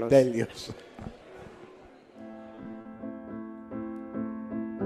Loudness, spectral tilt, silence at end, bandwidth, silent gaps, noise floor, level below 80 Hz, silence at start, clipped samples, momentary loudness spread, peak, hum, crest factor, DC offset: -32 LUFS; -6.5 dB/octave; 0 s; 13.5 kHz; none; -52 dBFS; -60 dBFS; 0 s; under 0.1%; 19 LU; -8 dBFS; none; 24 dB; under 0.1%